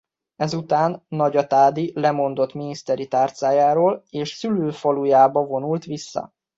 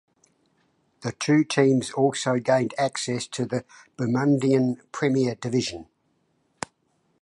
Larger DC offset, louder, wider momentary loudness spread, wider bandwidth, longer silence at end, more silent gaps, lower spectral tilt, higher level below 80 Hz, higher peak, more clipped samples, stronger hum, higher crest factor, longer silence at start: neither; first, -20 LUFS vs -24 LUFS; second, 11 LU vs 14 LU; second, 7.8 kHz vs 11.5 kHz; second, 0.3 s vs 1.4 s; neither; about the same, -6.5 dB/octave vs -5.5 dB/octave; about the same, -66 dBFS vs -64 dBFS; about the same, -4 dBFS vs -6 dBFS; neither; neither; about the same, 16 dB vs 20 dB; second, 0.4 s vs 1 s